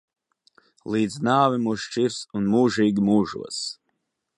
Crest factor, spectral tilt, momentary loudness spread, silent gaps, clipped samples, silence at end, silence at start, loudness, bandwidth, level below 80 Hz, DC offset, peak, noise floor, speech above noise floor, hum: 18 dB; -5.5 dB/octave; 11 LU; none; under 0.1%; 0.65 s; 0.85 s; -23 LUFS; 11.5 kHz; -60 dBFS; under 0.1%; -4 dBFS; -76 dBFS; 54 dB; none